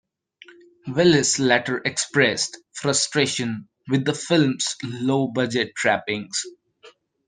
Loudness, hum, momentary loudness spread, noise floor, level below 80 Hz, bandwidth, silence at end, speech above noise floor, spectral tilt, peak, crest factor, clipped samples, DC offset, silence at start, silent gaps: -21 LUFS; none; 10 LU; -52 dBFS; -62 dBFS; 10 kHz; 0.4 s; 30 dB; -3.5 dB/octave; -2 dBFS; 20 dB; under 0.1%; under 0.1%; 0.85 s; none